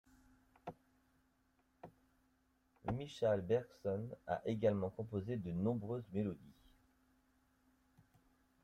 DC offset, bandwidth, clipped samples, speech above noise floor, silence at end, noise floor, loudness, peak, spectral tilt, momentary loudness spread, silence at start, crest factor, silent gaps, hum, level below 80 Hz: under 0.1%; 13 kHz; under 0.1%; 38 dB; 2.1 s; -77 dBFS; -40 LUFS; -24 dBFS; -8 dB/octave; 18 LU; 0.65 s; 20 dB; none; none; -70 dBFS